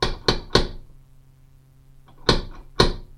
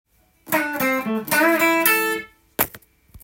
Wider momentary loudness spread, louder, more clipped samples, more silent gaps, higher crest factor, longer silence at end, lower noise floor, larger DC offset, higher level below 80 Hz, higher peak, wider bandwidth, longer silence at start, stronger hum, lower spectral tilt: about the same, 9 LU vs 8 LU; second, -23 LUFS vs -20 LUFS; neither; neither; about the same, 24 dB vs 20 dB; about the same, 0.1 s vs 0.05 s; first, -51 dBFS vs -46 dBFS; neither; first, -30 dBFS vs -56 dBFS; about the same, 0 dBFS vs -2 dBFS; second, 13 kHz vs 17 kHz; second, 0 s vs 0.45 s; neither; first, -4.5 dB/octave vs -2.5 dB/octave